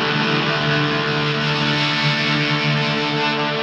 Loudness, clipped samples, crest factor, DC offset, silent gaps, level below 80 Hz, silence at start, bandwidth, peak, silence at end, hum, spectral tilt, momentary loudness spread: -18 LUFS; under 0.1%; 14 dB; under 0.1%; none; -54 dBFS; 0 s; 8.4 kHz; -6 dBFS; 0 s; none; -5 dB/octave; 2 LU